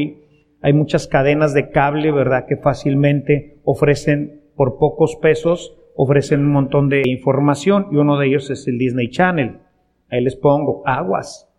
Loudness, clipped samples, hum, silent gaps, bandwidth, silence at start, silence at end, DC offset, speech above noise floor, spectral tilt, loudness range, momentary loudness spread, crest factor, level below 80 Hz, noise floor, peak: -17 LUFS; under 0.1%; none; none; 11 kHz; 0 s; 0.2 s; under 0.1%; 34 dB; -7.5 dB/octave; 2 LU; 7 LU; 14 dB; -44 dBFS; -50 dBFS; -2 dBFS